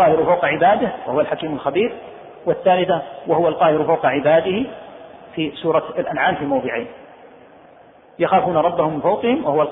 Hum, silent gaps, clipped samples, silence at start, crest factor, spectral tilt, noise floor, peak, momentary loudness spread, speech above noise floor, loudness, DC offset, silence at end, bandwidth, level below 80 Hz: none; none; under 0.1%; 0 s; 16 dB; -10 dB/octave; -47 dBFS; -4 dBFS; 11 LU; 29 dB; -18 LUFS; under 0.1%; 0 s; 4 kHz; -56 dBFS